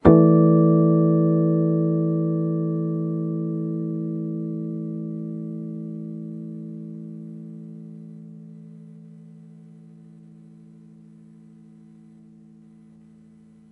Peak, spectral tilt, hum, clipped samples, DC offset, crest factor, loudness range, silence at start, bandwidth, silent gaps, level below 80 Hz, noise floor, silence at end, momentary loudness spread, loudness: 0 dBFS; -13 dB/octave; none; under 0.1%; under 0.1%; 24 dB; 26 LU; 0.05 s; 2.4 kHz; none; -54 dBFS; -50 dBFS; 4.2 s; 25 LU; -22 LUFS